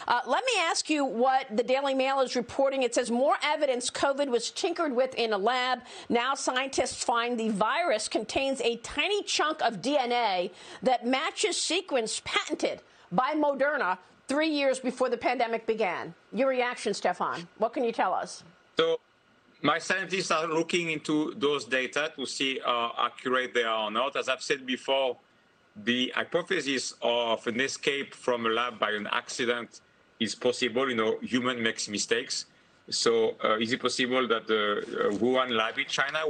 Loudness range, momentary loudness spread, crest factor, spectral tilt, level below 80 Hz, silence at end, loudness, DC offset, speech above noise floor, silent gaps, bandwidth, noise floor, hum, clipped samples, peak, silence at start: 3 LU; 5 LU; 20 dB; -2.5 dB/octave; -68 dBFS; 0 s; -28 LUFS; under 0.1%; 35 dB; none; 9.8 kHz; -63 dBFS; none; under 0.1%; -8 dBFS; 0 s